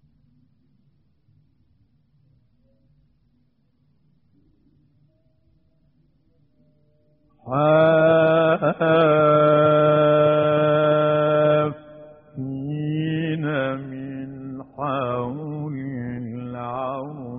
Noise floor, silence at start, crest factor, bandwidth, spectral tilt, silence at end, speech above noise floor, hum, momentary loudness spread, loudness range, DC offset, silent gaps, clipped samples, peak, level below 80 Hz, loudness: -65 dBFS; 7.45 s; 18 dB; 3.9 kHz; -6 dB/octave; 0 s; 48 dB; none; 16 LU; 12 LU; under 0.1%; none; under 0.1%; -4 dBFS; -60 dBFS; -20 LUFS